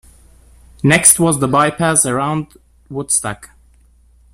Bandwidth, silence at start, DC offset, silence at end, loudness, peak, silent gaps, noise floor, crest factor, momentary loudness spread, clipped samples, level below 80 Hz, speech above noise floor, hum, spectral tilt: 15.5 kHz; 0.85 s; under 0.1%; 0.85 s; -13 LUFS; 0 dBFS; none; -49 dBFS; 18 dB; 19 LU; 0.1%; -46 dBFS; 35 dB; none; -3.5 dB/octave